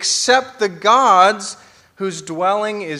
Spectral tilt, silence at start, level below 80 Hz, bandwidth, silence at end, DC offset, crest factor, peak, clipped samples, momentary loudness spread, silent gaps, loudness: -2 dB/octave; 0 s; -66 dBFS; 14.5 kHz; 0 s; under 0.1%; 16 dB; 0 dBFS; under 0.1%; 14 LU; none; -15 LUFS